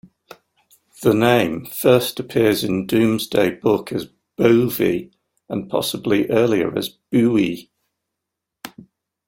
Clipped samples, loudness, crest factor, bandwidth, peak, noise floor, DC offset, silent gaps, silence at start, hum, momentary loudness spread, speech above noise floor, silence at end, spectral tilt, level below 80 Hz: under 0.1%; -19 LUFS; 18 dB; 16.5 kHz; -2 dBFS; -82 dBFS; under 0.1%; none; 1 s; none; 13 LU; 64 dB; 0.6 s; -5.5 dB/octave; -54 dBFS